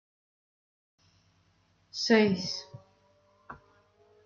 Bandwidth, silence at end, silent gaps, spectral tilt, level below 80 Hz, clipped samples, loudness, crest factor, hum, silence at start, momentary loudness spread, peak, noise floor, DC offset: 7.4 kHz; 0.7 s; none; -4.5 dB/octave; -74 dBFS; under 0.1%; -28 LUFS; 24 dB; 50 Hz at -60 dBFS; 1.95 s; 27 LU; -10 dBFS; -69 dBFS; under 0.1%